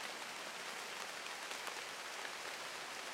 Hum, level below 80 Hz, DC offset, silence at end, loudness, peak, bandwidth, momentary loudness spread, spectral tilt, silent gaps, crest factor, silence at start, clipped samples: none; -90 dBFS; under 0.1%; 0 s; -45 LUFS; -24 dBFS; 16 kHz; 1 LU; 0 dB/octave; none; 22 dB; 0 s; under 0.1%